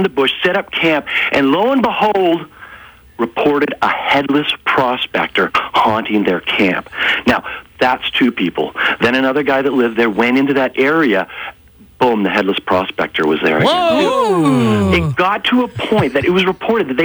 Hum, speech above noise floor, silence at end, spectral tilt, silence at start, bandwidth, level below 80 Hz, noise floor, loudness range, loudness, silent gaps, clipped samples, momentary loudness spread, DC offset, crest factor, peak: none; 25 dB; 0 s; -6 dB/octave; 0 s; over 20 kHz; -44 dBFS; -39 dBFS; 2 LU; -14 LUFS; none; under 0.1%; 4 LU; under 0.1%; 14 dB; 0 dBFS